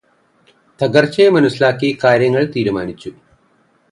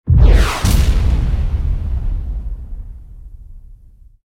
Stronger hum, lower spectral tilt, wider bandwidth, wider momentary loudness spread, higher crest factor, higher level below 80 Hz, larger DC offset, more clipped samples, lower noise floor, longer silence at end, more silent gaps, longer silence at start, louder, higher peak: neither; about the same, -6.5 dB/octave vs -6 dB/octave; second, 11 kHz vs 16 kHz; second, 14 LU vs 21 LU; about the same, 16 dB vs 14 dB; second, -54 dBFS vs -16 dBFS; neither; neither; first, -57 dBFS vs -42 dBFS; first, 0.8 s vs 0.5 s; neither; first, 0.8 s vs 0.05 s; first, -14 LUFS vs -17 LUFS; about the same, 0 dBFS vs 0 dBFS